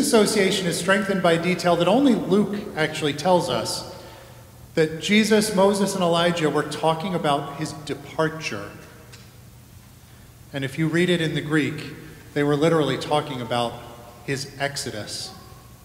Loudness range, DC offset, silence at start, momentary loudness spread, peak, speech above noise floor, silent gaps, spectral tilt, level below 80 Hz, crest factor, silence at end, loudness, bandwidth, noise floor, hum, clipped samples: 7 LU; under 0.1%; 0 s; 15 LU; -4 dBFS; 25 dB; none; -4.5 dB/octave; -54 dBFS; 20 dB; 0.1 s; -22 LUFS; 16 kHz; -47 dBFS; none; under 0.1%